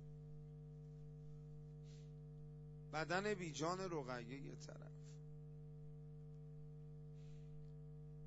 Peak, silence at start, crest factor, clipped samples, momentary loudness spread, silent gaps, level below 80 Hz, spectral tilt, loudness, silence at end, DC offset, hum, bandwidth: -26 dBFS; 0 s; 24 dB; under 0.1%; 13 LU; none; -66 dBFS; -5 dB/octave; -51 LUFS; 0 s; under 0.1%; 50 Hz at -55 dBFS; 7.6 kHz